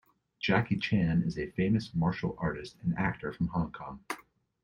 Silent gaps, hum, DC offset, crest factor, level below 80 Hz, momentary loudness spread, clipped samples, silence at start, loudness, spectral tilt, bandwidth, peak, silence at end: none; none; under 0.1%; 20 dB; -54 dBFS; 12 LU; under 0.1%; 0.4 s; -32 LUFS; -7.5 dB/octave; 11 kHz; -12 dBFS; 0.45 s